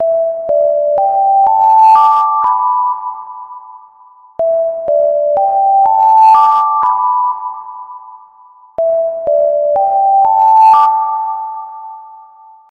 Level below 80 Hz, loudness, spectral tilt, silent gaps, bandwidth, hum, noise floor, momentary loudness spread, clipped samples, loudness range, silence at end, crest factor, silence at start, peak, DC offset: -58 dBFS; -10 LUFS; -4.5 dB/octave; none; 6.4 kHz; none; -42 dBFS; 21 LU; under 0.1%; 5 LU; 0.55 s; 12 dB; 0 s; 0 dBFS; under 0.1%